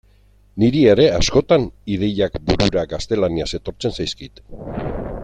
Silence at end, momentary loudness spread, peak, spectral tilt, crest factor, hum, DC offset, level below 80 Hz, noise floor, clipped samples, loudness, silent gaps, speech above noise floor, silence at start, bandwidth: 0 s; 16 LU; 0 dBFS; -5.5 dB/octave; 18 dB; none; under 0.1%; -34 dBFS; -52 dBFS; under 0.1%; -18 LUFS; none; 34 dB; 0.55 s; 9.6 kHz